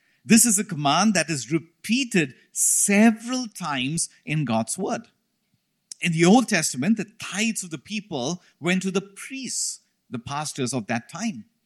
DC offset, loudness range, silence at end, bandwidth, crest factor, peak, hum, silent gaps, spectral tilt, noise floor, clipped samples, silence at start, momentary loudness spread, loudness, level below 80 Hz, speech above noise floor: under 0.1%; 7 LU; 0.25 s; 15.5 kHz; 20 dB; -4 dBFS; none; none; -3.5 dB/octave; -72 dBFS; under 0.1%; 0.25 s; 14 LU; -23 LUFS; -66 dBFS; 49 dB